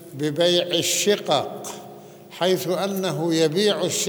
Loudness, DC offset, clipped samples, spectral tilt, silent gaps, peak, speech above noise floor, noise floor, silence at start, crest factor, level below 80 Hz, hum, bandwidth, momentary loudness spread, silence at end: -21 LUFS; under 0.1%; under 0.1%; -3.5 dB/octave; none; -4 dBFS; 21 dB; -42 dBFS; 0 s; 18 dB; -72 dBFS; none; over 20 kHz; 15 LU; 0 s